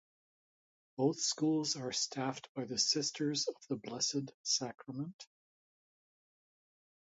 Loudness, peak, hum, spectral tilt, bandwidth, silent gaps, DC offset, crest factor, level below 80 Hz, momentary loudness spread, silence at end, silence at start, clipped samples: -35 LUFS; -18 dBFS; none; -3 dB/octave; 8 kHz; 2.49-2.55 s, 4.34-4.44 s, 5.14-5.19 s; under 0.1%; 22 dB; -82 dBFS; 12 LU; 1.95 s; 1 s; under 0.1%